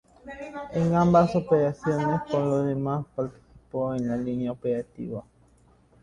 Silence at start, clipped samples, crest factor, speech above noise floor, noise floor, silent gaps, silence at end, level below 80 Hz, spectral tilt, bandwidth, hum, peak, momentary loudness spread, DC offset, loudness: 0.25 s; under 0.1%; 20 dB; 34 dB; -59 dBFS; none; 0.8 s; -54 dBFS; -8.5 dB/octave; 9.8 kHz; none; -6 dBFS; 16 LU; under 0.1%; -26 LUFS